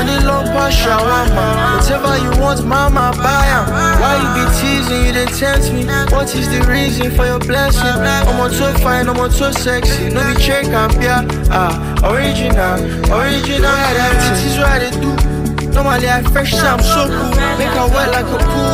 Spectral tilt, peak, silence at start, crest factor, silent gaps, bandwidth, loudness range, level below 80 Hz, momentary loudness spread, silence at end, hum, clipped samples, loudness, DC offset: -4.5 dB/octave; 0 dBFS; 0 s; 12 dB; none; 16 kHz; 1 LU; -18 dBFS; 3 LU; 0 s; none; under 0.1%; -13 LUFS; under 0.1%